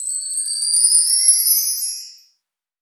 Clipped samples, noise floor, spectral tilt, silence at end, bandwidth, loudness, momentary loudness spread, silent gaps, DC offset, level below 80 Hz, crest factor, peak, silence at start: under 0.1%; -72 dBFS; 9 dB/octave; 0.7 s; over 20 kHz; -14 LUFS; 10 LU; none; under 0.1%; -88 dBFS; 18 dB; -2 dBFS; 0 s